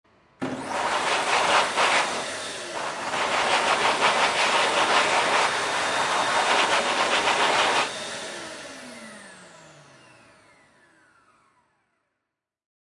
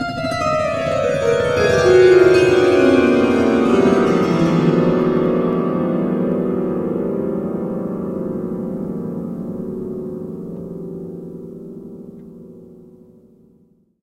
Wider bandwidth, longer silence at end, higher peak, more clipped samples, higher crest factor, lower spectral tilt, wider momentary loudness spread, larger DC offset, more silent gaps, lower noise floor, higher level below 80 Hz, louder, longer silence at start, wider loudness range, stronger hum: about the same, 11.5 kHz vs 11 kHz; first, 3.35 s vs 1.3 s; second, -6 dBFS vs 0 dBFS; neither; about the same, 18 dB vs 18 dB; second, -1 dB/octave vs -7 dB/octave; second, 15 LU vs 18 LU; neither; neither; first, -84 dBFS vs -55 dBFS; second, -66 dBFS vs -46 dBFS; second, -22 LUFS vs -17 LUFS; first, 0.4 s vs 0 s; second, 9 LU vs 18 LU; neither